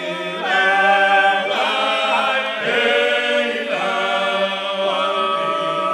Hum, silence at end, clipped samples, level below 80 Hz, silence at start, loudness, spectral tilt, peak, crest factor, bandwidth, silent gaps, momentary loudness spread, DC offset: none; 0 s; under 0.1%; -80 dBFS; 0 s; -17 LUFS; -3 dB/octave; -2 dBFS; 16 dB; 13 kHz; none; 6 LU; under 0.1%